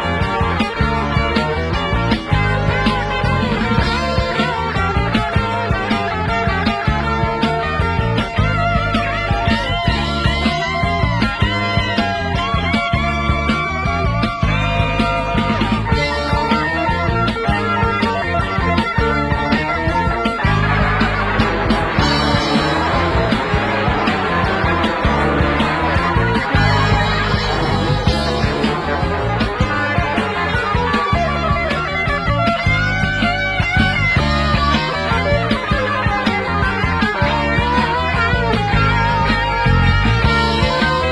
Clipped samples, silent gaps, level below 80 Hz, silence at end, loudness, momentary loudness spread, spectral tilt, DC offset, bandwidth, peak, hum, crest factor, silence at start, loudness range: under 0.1%; none; -26 dBFS; 0 s; -16 LUFS; 3 LU; -6 dB/octave; under 0.1%; 11 kHz; -2 dBFS; none; 14 dB; 0 s; 2 LU